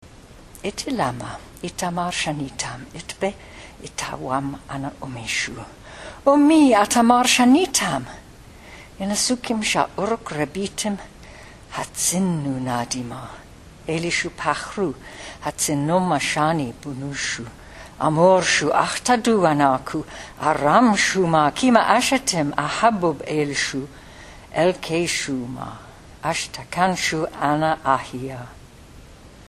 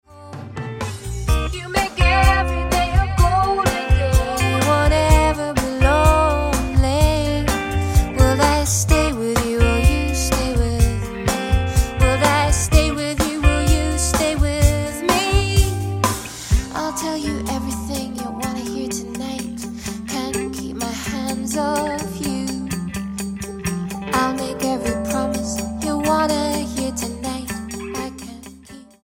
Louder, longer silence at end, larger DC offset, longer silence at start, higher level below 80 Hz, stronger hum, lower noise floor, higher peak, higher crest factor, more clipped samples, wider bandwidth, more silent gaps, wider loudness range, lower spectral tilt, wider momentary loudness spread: about the same, -21 LUFS vs -20 LUFS; second, 0.05 s vs 0.2 s; neither; about the same, 0.05 s vs 0.1 s; second, -48 dBFS vs -24 dBFS; neither; about the same, -44 dBFS vs -42 dBFS; about the same, 0 dBFS vs 0 dBFS; about the same, 22 dB vs 18 dB; neither; second, 14 kHz vs 16.5 kHz; neither; first, 10 LU vs 7 LU; about the same, -4 dB/octave vs -5 dB/octave; first, 19 LU vs 11 LU